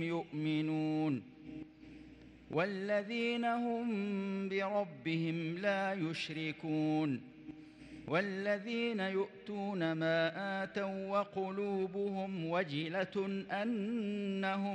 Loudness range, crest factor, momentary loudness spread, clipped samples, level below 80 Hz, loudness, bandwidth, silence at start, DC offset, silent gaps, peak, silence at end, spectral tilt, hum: 1 LU; 16 dB; 14 LU; under 0.1%; -74 dBFS; -37 LUFS; 9.8 kHz; 0 s; under 0.1%; none; -22 dBFS; 0 s; -7 dB/octave; none